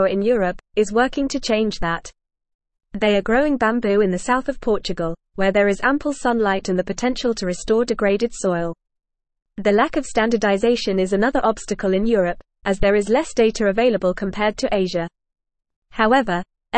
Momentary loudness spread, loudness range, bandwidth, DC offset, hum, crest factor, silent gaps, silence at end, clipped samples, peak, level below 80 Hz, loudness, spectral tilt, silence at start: 7 LU; 2 LU; 8.8 kHz; 0.3%; none; 16 dB; 2.55-2.59 s, 15.76-15.82 s; 0 s; under 0.1%; -4 dBFS; -40 dBFS; -20 LUFS; -5 dB/octave; 0 s